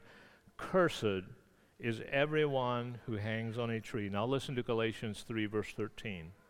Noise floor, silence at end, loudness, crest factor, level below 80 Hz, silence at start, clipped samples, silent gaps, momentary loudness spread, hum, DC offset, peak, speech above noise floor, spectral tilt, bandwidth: -60 dBFS; 0.15 s; -36 LUFS; 20 dB; -64 dBFS; 0 s; under 0.1%; none; 10 LU; none; under 0.1%; -16 dBFS; 25 dB; -6 dB/octave; 16 kHz